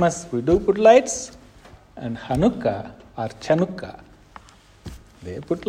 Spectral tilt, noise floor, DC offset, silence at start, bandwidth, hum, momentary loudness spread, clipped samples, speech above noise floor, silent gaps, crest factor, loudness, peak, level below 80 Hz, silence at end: -5.5 dB/octave; -48 dBFS; under 0.1%; 0 s; 14 kHz; none; 25 LU; under 0.1%; 27 dB; none; 20 dB; -21 LUFS; -2 dBFS; -46 dBFS; 0 s